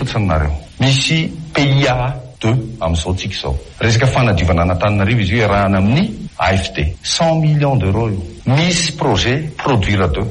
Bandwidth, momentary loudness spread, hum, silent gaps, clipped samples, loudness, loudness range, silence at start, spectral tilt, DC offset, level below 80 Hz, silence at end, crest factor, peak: 10.5 kHz; 7 LU; none; none; under 0.1%; -15 LUFS; 2 LU; 0 s; -5.5 dB/octave; under 0.1%; -28 dBFS; 0 s; 12 dB; -4 dBFS